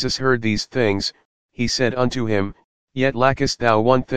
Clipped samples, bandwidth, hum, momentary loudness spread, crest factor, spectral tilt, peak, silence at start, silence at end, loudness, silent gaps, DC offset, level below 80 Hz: under 0.1%; 9.8 kHz; none; 8 LU; 20 dB; -5 dB/octave; 0 dBFS; 0 s; 0 s; -20 LUFS; 1.25-1.49 s, 2.64-2.88 s; 2%; -44 dBFS